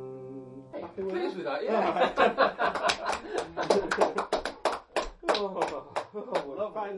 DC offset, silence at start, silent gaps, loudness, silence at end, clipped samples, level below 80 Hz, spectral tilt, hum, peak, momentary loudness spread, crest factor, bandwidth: under 0.1%; 0 s; none; -29 LUFS; 0 s; under 0.1%; -56 dBFS; -3.5 dB/octave; none; -8 dBFS; 14 LU; 22 dB; 11.5 kHz